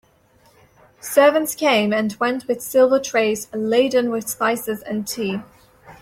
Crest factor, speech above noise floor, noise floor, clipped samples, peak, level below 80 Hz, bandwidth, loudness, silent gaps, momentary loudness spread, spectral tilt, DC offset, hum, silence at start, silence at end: 18 dB; 37 dB; -56 dBFS; under 0.1%; -2 dBFS; -62 dBFS; 16.5 kHz; -19 LUFS; none; 10 LU; -3.5 dB/octave; under 0.1%; none; 1.05 s; 0.1 s